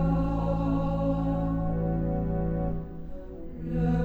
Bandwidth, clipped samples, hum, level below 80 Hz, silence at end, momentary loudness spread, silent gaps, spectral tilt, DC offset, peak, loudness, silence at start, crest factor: 4.3 kHz; under 0.1%; none; -34 dBFS; 0 s; 14 LU; none; -10.5 dB/octave; under 0.1%; -14 dBFS; -29 LUFS; 0 s; 12 dB